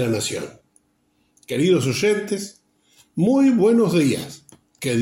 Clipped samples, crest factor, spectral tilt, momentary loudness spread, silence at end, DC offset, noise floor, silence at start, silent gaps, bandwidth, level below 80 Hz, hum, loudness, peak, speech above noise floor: under 0.1%; 14 dB; -5.5 dB/octave; 16 LU; 0 s; under 0.1%; -65 dBFS; 0 s; none; 16.5 kHz; -62 dBFS; none; -20 LUFS; -6 dBFS; 46 dB